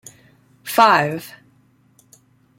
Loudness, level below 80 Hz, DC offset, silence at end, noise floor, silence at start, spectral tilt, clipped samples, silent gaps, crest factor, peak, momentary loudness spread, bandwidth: -16 LUFS; -68 dBFS; under 0.1%; 1.3 s; -57 dBFS; 0.65 s; -4 dB/octave; under 0.1%; none; 20 dB; -2 dBFS; 23 LU; 16.5 kHz